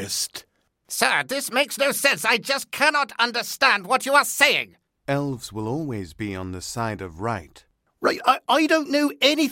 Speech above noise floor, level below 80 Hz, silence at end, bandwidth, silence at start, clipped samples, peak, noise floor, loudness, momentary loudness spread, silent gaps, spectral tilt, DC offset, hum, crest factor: 37 dB; -60 dBFS; 0 s; 16.5 kHz; 0 s; under 0.1%; -2 dBFS; -59 dBFS; -22 LUFS; 13 LU; none; -3 dB/octave; under 0.1%; none; 22 dB